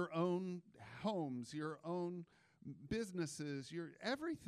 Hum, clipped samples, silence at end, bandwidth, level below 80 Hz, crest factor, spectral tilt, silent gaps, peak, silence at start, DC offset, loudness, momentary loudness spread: none; under 0.1%; 0 s; 13.5 kHz; -74 dBFS; 18 dB; -6 dB/octave; none; -26 dBFS; 0 s; under 0.1%; -44 LUFS; 16 LU